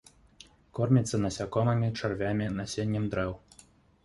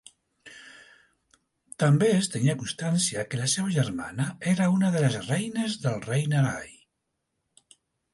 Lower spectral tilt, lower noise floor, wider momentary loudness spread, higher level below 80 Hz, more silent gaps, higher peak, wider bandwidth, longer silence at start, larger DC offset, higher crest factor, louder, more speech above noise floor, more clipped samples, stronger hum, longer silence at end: first, -6.5 dB/octave vs -5 dB/octave; second, -59 dBFS vs -80 dBFS; second, 8 LU vs 12 LU; first, -52 dBFS vs -64 dBFS; neither; about the same, -12 dBFS vs -10 dBFS; about the same, 11.5 kHz vs 11.5 kHz; first, 0.75 s vs 0.45 s; neither; about the same, 18 dB vs 18 dB; second, -30 LUFS vs -26 LUFS; second, 31 dB vs 55 dB; neither; neither; second, 0.65 s vs 1.4 s